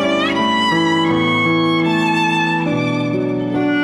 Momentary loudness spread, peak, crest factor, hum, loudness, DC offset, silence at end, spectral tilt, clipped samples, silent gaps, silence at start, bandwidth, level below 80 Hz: 4 LU; -6 dBFS; 10 dB; none; -16 LUFS; under 0.1%; 0 s; -5.5 dB/octave; under 0.1%; none; 0 s; 11 kHz; -52 dBFS